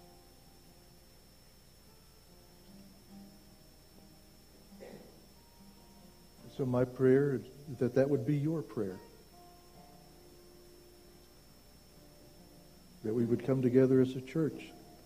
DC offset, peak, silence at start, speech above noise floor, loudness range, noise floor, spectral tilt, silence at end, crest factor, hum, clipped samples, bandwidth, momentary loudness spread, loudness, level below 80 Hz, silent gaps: under 0.1%; -14 dBFS; 2.75 s; 29 dB; 23 LU; -60 dBFS; -8 dB/octave; 0.25 s; 22 dB; none; under 0.1%; 15.5 kHz; 28 LU; -32 LUFS; -64 dBFS; none